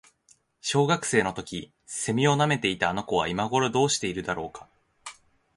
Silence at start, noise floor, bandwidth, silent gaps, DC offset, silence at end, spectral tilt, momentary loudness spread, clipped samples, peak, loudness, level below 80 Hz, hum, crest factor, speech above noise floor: 0.65 s; -63 dBFS; 11.5 kHz; none; under 0.1%; 0.45 s; -4 dB/octave; 16 LU; under 0.1%; -6 dBFS; -26 LUFS; -56 dBFS; none; 20 dB; 37 dB